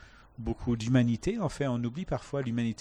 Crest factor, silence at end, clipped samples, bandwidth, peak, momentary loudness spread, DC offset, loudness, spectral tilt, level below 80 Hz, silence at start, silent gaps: 18 dB; 0.05 s; under 0.1%; 10.5 kHz; -14 dBFS; 9 LU; under 0.1%; -31 LUFS; -7 dB/octave; -48 dBFS; 0.4 s; none